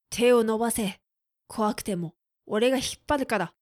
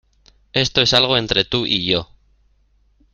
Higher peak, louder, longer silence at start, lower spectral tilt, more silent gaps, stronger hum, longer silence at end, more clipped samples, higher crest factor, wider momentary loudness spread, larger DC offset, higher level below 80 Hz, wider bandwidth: second, -10 dBFS vs 0 dBFS; second, -26 LUFS vs -16 LUFS; second, 0.1 s vs 0.55 s; about the same, -4 dB/octave vs -3.5 dB/octave; neither; neither; second, 0.15 s vs 1.1 s; neither; about the same, 16 dB vs 20 dB; first, 12 LU vs 7 LU; neither; second, -54 dBFS vs -44 dBFS; first, 15.5 kHz vs 13 kHz